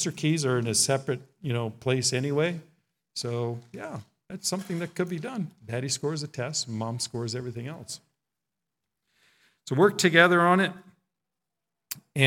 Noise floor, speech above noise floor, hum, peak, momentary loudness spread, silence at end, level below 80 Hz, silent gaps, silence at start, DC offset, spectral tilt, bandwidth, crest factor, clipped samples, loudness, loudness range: -87 dBFS; 60 dB; none; -4 dBFS; 19 LU; 0 s; -72 dBFS; none; 0 s; under 0.1%; -4 dB/octave; 18 kHz; 24 dB; under 0.1%; -26 LUFS; 9 LU